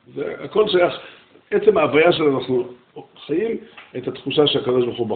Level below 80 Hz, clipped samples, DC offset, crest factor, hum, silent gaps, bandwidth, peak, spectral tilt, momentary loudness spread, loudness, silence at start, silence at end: -58 dBFS; under 0.1%; under 0.1%; 18 dB; none; none; 4.6 kHz; -2 dBFS; -3.5 dB/octave; 15 LU; -19 LUFS; 0.15 s; 0 s